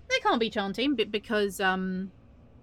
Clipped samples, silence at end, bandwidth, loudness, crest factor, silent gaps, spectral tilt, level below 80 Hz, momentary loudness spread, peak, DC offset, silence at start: under 0.1%; 0.5 s; 16.5 kHz; -28 LUFS; 16 dB; none; -4.5 dB/octave; -58 dBFS; 8 LU; -14 dBFS; under 0.1%; 0.1 s